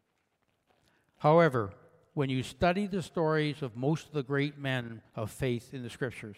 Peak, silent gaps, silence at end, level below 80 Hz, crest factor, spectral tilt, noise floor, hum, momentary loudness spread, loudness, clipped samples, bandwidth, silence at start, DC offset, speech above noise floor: -12 dBFS; none; 0.05 s; -60 dBFS; 20 dB; -6.5 dB/octave; -77 dBFS; none; 15 LU; -31 LUFS; under 0.1%; 15 kHz; 1.2 s; under 0.1%; 46 dB